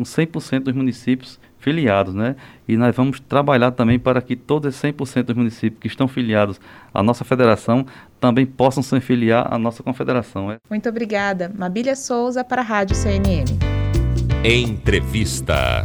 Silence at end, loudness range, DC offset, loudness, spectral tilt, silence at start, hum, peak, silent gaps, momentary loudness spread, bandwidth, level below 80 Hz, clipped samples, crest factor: 0 s; 3 LU; under 0.1%; -19 LUFS; -6 dB/octave; 0 s; none; -2 dBFS; none; 8 LU; 19.5 kHz; -32 dBFS; under 0.1%; 16 dB